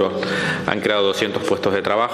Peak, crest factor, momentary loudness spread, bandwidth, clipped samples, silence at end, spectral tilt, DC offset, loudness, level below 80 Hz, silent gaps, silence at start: 0 dBFS; 20 dB; 3 LU; 14.5 kHz; under 0.1%; 0 s; -4.5 dB/octave; under 0.1%; -20 LUFS; -56 dBFS; none; 0 s